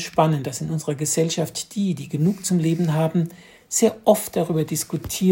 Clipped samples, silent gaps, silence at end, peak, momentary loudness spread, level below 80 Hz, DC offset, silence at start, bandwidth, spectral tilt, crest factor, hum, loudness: under 0.1%; none; 0 s; -2 dBFS; 7 LU; -56 dBFS; under 0.1%; 0 s; 16.5 kHz; -5.5 dB/octave; 20 dB; none; -22 LUFS